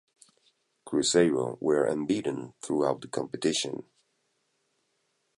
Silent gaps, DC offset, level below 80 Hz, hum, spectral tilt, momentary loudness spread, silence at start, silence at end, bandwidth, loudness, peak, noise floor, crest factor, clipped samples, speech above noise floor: none; under 0.1%; -68 dBFS; none; -4 dB/octave; 11 LU; 0.85 s; 1.55 s; 11.5 kHz; -28 LUFS; -10 dBFS; -75 dBFS; 20 dB; under 0.1%; 48 dB